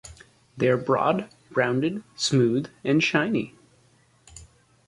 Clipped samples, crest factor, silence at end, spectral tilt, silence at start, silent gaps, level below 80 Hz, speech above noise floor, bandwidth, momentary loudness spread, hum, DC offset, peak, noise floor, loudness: under 0.1%; 20 dB; 0.45 s; -5.5 dB/octave; 0.05 s; none; -60 dBFS; 37 dB; 11.5 kHz; 8 LU; none; under 0.1%; -6 dBFS; -60 dBFS; -24 LUFS